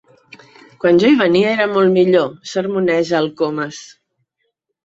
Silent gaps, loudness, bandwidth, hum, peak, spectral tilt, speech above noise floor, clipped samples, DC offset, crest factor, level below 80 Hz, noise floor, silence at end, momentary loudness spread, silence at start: none; -15 LUFS; 7.8 kHz; none; -2 dBFS; -6 dB/octave; 57 dB; under 0.1%; under 0.1%; 14 dB; -60 dBFS; -71 dBFS; 1 s; 10 LU; 0.85 s